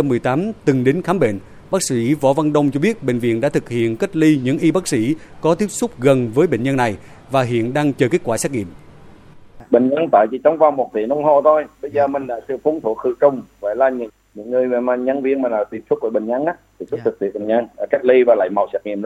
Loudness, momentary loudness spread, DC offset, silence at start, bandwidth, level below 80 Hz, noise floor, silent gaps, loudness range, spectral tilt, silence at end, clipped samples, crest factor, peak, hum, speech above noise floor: -18 LUFS; 8 LU; under 0.1%; 0 s; 14.5 kHz; -52 dBFS; -41 dBFS; none; 3 LU; -6 dB/octave; 0 s; under 0.1%; 18 dB; 0 dBFS; none; 25 dB